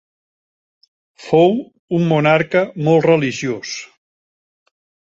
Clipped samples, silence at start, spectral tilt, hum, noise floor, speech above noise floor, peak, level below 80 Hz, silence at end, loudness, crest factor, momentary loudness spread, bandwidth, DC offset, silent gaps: under 0.1%; 1.2 s; -6.5 dB/octave; none; under -90 dBFS; over 75 dB; 0 dBFS; -60 dBFS; 1.3 s; -16 LUFS; 18 dB; 11 LU; 7.8 kHz; under 0.1%; 1.79-1.88 s